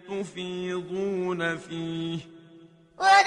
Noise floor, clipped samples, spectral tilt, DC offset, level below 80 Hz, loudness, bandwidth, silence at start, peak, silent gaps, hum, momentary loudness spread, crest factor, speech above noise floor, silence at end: -53 dBFS; under 0.1%; -4 dB/octave; under 0.1%; -68 dBFS; -29 LUFS; 10.5 kHz; 0.05 s; -6 dBFS; none; none; 8 LU; 20 dB; 27 dB; 0 s